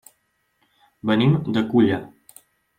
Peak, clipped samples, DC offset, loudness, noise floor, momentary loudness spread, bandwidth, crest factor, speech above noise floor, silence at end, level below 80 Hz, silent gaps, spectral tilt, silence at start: -6 dBFS; under 0.1%; under 0.1%; -20 LUFS; -69 dBFS; 11 LU; 15.5 kHz; 16 dB; 50 dB; 0.7 s; -60 dBFS; none; -7.5 dB/octave; 1.05 s